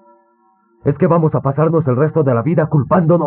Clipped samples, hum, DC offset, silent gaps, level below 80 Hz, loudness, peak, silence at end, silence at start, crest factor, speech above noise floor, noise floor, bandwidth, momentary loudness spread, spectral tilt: under 0.1%; none; under 0.1%; none; -50 dBFS; -15 LUFS; -2 dBFS; 0 s; 0.85 s; 14 dB; 43 dB; -56 dBFS; 3.1 kHz; 3 LU; -11 dB/octave